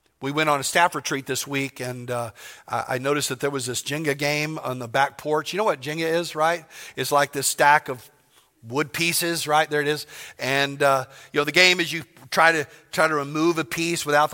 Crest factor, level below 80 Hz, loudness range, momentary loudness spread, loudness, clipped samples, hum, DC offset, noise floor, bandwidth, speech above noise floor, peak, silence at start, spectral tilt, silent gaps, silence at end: 22 dB; -66 dBFS; 5 LU; 12 LU; -22 LUFS; under 0.1%; none; under 0.1%; -59 dBFS; 17 kHz; 36 dB; -2 dBFS; 0.2 s; -3 dB/octave; none; 0 s